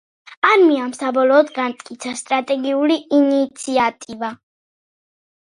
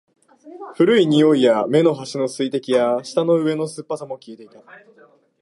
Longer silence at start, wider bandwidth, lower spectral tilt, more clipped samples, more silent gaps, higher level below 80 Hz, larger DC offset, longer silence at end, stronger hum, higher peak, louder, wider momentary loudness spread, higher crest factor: second, 0.3 s vs 0.45 s; about the same, 11.5 kHz vs 11.5 kHz; second, -3 dB/octave vs -6 dB/octave; neither; first, 0.37-0.42 s vs none; about the same, -68 dBFS vs -72 dBFS; neither; about the same, 1.05 s vs 0.95 s; neither; first, 0 dBFS vs -4 dBFS; about the same, -17 LUFS vs -18 LUFS; about the same, 14 LU vs 16 LU; about the same, 18 dB vs 16 dB